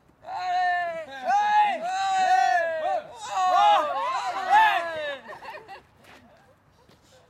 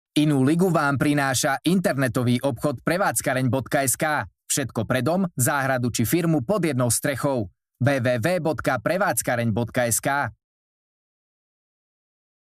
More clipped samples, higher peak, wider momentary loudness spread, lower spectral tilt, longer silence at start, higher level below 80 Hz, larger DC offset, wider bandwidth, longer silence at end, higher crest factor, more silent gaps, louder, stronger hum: neither; about the same, -8 dBFS vs -6 dBFS; first, 16 LU vs 5 LU; second, -1.5 dB/octave vs -5 dB/octave; about the same, 0.25 s vs 0.15 s; second, -70 dBFS vs -56 dBFS; neither; second, 13.5 kHz vs 15.5 kHz; second, 1.5 s vs 2.1 s; about the same, 16 dB vs 18 dB; neither; about the same, -24 LUFS vs -22 LUFS; neither